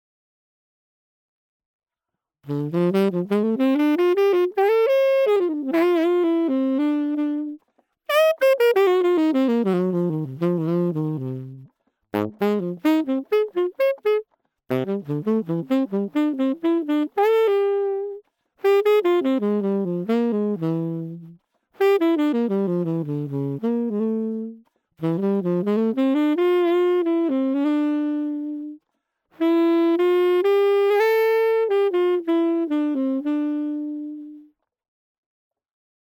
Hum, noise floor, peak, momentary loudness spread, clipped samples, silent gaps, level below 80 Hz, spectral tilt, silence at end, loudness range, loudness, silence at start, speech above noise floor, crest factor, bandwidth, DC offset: none; -85 dBFS; -8 dBFS; 10 LU; under 0.1%; none; -76 dBFS; -8 dB/octave; 1.6 s; 5 LU; -21 LUFS; 2.45 s; 64 dB; 14 dB; 18.5 kHz; under 0.1%